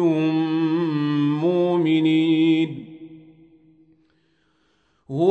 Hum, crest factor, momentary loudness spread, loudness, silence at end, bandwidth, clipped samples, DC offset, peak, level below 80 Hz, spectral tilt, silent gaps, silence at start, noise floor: none; 16 dB; 13 LU; -20 LUFS; 0 s; 4.7 kHz; under 0.1%; under 0.1%; -6 dBFS; -72 dBFS; -8.5 dB/octave; none; 0 s; -65 dBFS